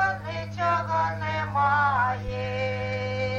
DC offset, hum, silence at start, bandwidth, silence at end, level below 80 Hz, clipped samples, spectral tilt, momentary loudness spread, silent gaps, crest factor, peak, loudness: under 0.1%; none; 0 s; 7.8 kHz; 0 s; -48 dBFS; under 0.1%; -6 dB/octave; 8 LU; none; 14 dB; -12 dBFS; -26 LUFS